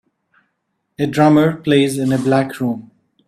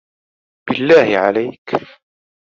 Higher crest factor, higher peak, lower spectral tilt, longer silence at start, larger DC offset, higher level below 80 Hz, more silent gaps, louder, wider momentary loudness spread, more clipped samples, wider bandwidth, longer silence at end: about the same, 16 dB vs 16 dB; about the same, 0 dBFS vs -2 dBFS; about the same, -6.5 dB/octave vs -6 dB/octave; first, 1 s vs 0.65 s; neither; about the same, -56 dBFS vs -60 dBFS; second, none vs 1.58-1.65 s; about the same, -16 LUFS vs -15 LUFS; about the same, 11 LU vs 12 LU; neither; first, 14 kHz vs 7.2 kHz; second, 0.45 s vs 0.65 s